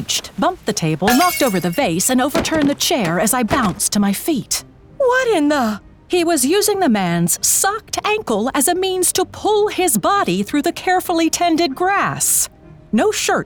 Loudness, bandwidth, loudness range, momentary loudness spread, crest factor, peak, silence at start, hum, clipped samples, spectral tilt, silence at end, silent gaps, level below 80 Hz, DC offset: -16 LUFS; over 20 kHz; 1 LU; 5 LU; 14 dB; -2 dBFS; 0 s; none; under 0.1%; -3.5 dB/octave; 0 s; none; -46 dBFS; under 0.1%